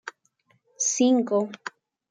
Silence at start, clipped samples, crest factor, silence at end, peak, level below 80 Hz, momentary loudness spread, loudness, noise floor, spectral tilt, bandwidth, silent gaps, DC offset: 0.05 s; under 0.1%; 16 dB; 0.4 s; -10 dBFS; -84 dBFS; 19 LU; -23 LUFS; -67 dBFS; -3 dB/octave; 9.6 kHz; none; under 0.1%